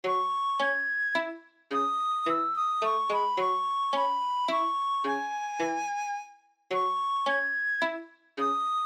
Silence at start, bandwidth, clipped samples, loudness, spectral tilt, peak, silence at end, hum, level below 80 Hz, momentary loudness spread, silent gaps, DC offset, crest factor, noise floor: 0.05 s; 14 kHz; under 0.1%; -28 LUFS; -2.5 dB/octave; -16 dBFS; 0 s; none; under -90 dBFS; 6 LU; none; under 0.1%; 14 dB; -51 dBFS